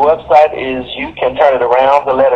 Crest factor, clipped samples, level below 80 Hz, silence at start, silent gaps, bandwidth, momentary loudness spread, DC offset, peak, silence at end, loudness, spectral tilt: 10 dB; under 0.1%; -42 dBFS; 0 s; none; 7.8 kHz; 10 LU; under 0.1%; 0 dBFS; 0 s; -11 LUFS; -6 dB/octave